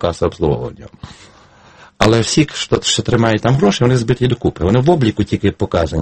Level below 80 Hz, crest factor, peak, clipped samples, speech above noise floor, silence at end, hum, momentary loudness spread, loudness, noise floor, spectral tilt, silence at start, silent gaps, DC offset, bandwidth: -36 dBFS; 16 dB; 0 dBFS; under 0.1%; 30 dB; 0 s; none; 6 LU; -15 LUFS; -44 dBFS; -5.5 dB/octave; 0 s; none; under 0.1%; 8.8 kHz